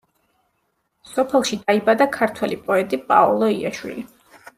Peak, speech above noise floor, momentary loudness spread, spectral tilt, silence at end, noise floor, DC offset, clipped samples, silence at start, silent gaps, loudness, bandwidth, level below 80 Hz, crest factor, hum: -2 dBFS; 51 dB; 14 LU; -4.5 dB/octave; 0.5 s; -70 dBFS; under 0.1%; under 0.1%; 1.1 s; none; -19 LUFS; 15.5 kHz; -62 dBFS; 18 dB; none